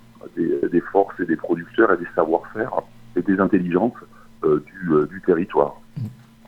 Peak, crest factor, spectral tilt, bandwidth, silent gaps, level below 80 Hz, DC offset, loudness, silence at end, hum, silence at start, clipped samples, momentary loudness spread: -2 dBFS; 20 dB; -9 dB/octave; 5.4 kHz; none; -54 dBFS; under 0.1%; -21 LUFS; 0.35 s; none; 0.25 s; under 0.1%; 10 LU